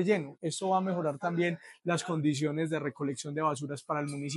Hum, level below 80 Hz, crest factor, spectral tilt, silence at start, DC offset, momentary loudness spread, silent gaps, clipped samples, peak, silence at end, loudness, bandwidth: none; -80 dBFS; 18 dB; -5.5 dB/octave; 0 s; under 0.1%; 5 LU; none; under 0.1%; -14 dBFS; 0 s; -32 LUFS; 12 kHz